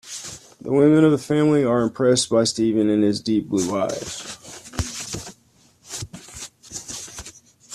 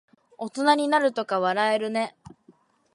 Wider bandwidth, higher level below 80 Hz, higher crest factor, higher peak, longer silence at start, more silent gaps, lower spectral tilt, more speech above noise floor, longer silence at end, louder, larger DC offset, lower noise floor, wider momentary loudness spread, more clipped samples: first, 14 kHz vs 11.5 kHz; first, -48 dBFS vs -70 dBFS; about the same, 18 dB vs 18 dB; first, -4 dBFS vs -8 dBFS; second, 0.05 s vs 0.4 s; neither; about the same, -5 dB/octave vs -4 dB/octave; about the same, 38 dB vs 36 dB; second, 0 s vs 0.85 s; first, -20 LUFS vs -24 LUFS; neither; about the same, -57 dBFS vs -59 dBFS; first, 19 LU vs 13 LU; neither